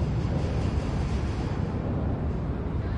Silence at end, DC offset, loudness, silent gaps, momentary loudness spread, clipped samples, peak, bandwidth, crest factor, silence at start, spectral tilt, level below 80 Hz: 0 s; under 0.1%; -29 LUFS; none; 3 LU; under 0.1%; -16 dBFS; 10 kHz; 12 dB; 0 s; -8 dB/octave; -34 dBFS